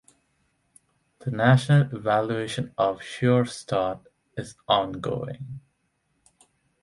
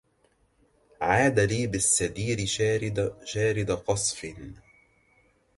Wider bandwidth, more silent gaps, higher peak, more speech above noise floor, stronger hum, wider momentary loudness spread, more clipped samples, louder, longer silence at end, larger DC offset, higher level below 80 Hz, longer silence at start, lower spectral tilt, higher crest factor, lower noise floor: about the same, 11.5 kHz vs 11.5 kHz; neither; about the same, -6 dBFS vs -8 dBFS; first, 48 dB vs 41 dB; neither; first, 18 LU vs 11 LU; neither; about the same, -24 LUFS vs -26 LUFS; first, 1.25 s vs 1 s; neither; second, -60 dBFS vs -50 dBFS; first, 1.25 s vs 1 s; first, -6.5 dB/octave vs -4 dB/octave; about the same, 20 dB vs 20 dB; first, -72 dBFS vs -67 dBFS